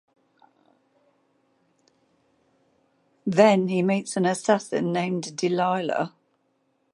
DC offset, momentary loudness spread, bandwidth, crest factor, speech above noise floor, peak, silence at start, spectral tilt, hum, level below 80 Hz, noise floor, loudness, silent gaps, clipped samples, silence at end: under 0.1%; 10 LU; 11.5 kHz; 22 dB; 48 dB; -4 dBFS; 3.25 s; -5.5 dB/octave; none; -76 dBFS; -70 dBFS; -23 LUFS; none; under 0.1%; 0.85 s